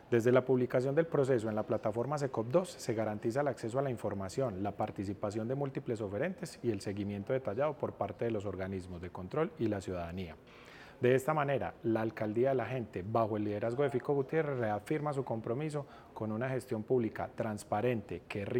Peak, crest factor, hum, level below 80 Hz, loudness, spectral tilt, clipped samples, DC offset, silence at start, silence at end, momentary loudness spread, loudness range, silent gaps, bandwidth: -12 dBFS; 22 dB; none; -66 dBFS; -35 LUFS; -7 dB/octave; under 0.1%; under 0.1%; 0.05 s; 0 s; 9 LU; 4 LU; none; 16.5 kHz